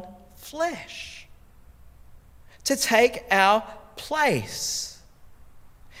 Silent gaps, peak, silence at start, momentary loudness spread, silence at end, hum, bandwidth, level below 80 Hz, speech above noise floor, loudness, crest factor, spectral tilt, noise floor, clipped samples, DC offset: none; -4 dBFS; 0 s; 21 LU; 0 s; none; 17 kHz; -54 dBFS; 27 dB; -23 LUFS; 24 dB; -2.5 dB/octave; -50 dBFS; under 0.1%; under 0.1%